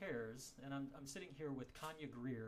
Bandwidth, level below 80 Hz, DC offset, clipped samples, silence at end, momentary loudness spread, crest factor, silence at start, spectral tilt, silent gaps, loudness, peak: 15.5 kHz; -70 dBFS; under 0.1%; under 0.1%; 0 s; 4 LU; 14 dB; 0 s; -5 dB/octave; none; -50 LUFS; -34 dBFS